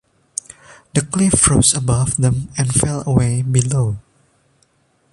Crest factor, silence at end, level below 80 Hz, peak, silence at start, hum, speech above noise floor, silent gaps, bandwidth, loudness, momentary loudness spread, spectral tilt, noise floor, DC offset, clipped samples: 18 dB; 1.1 s; -36 dBFS; 0 dBFS; 0.95 s; none; 44 dB; none; 11.5 kHz; -16 LUFS; 17 LU; -4.5 dB/octave; -60 dBFS; under 0.1%; under 0.1%